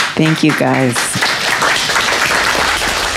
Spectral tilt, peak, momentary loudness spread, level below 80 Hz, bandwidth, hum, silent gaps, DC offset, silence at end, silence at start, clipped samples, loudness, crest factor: -3 dB/octave; 0 dBFS; 2 LU; -38 dBFS; 16.5 kHz; none; none; under 0.1%; 0 s; 0 s; under 0.1%; -12 LUFS; 14 dB